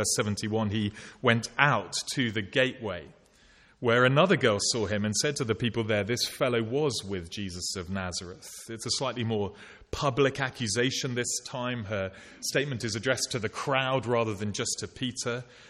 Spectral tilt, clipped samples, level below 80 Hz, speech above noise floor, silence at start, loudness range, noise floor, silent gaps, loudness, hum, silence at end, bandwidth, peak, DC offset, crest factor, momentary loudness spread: -4 dB/octave; under 0.1%; -58 dBFS; 30 dB; 0 s; 5 LU; -59 dBFS; none; -28 LUFS; none; 0 s; 14 kHz; -4 dBFS; under 0.1%; 26 dB; 11 LU